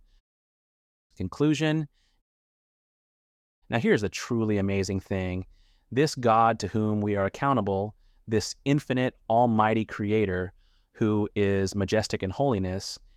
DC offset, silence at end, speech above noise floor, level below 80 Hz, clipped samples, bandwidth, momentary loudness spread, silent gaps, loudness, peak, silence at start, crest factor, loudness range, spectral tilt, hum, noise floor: under 0.1%; 0.2 s; over 64 dB; -56 dBFS; under 0.1%; 14 kHz; 9 LU; 2.21-3.62 s; -26 LUFS; -8 dBFS; 1.2 s; 18 dB; 4 LU; -6 dB/octave; none; under -90 dBFS